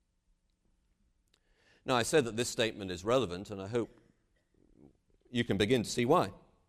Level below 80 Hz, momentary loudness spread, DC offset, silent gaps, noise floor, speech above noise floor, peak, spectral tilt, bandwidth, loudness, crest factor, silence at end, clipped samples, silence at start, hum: -62 dBFS; 10 LU; under 0.1%; none; -75 dBFS; 43 dB; -14 dBFS; -4.5 dB/octave; 15 kHz; -32 LUFS; 20 dB; 0.3 s; under 0.1%; 1.85 s; none